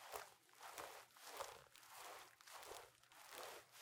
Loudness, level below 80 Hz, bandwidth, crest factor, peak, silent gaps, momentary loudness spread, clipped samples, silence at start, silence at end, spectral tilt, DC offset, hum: -57 LUFS; -86 dBFS; 17.5 kHz; 26 dB; -32 dBFS; none; 8 LU; under 0.1%; 0 s; 0 s; -0.5 dB/octave; under 0.1%; none